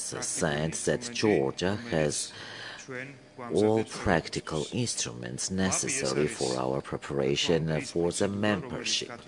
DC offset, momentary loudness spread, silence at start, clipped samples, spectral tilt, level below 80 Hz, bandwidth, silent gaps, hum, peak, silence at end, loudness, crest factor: under 0.1%; 11 LU; 0 s; under 0.1%; -4 dB/octave; -56 dBFS; 11 kHz; none; none; -8 dBFS; 0 s; -29 LUFS; 22 dB